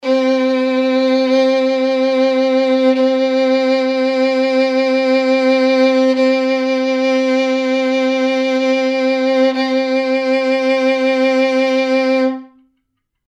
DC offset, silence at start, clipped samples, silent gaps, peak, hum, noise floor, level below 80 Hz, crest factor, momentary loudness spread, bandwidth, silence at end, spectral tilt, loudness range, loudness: under 0.1%; 0.05 s; under 0.1%; none; -2 dBFS; none; -70 dBFS; -74 dBFS; 12 dB; 3 LU; 8.2 kHz; 0.8 s; -3.5 dB/octave; 1 LU; -14 LUFS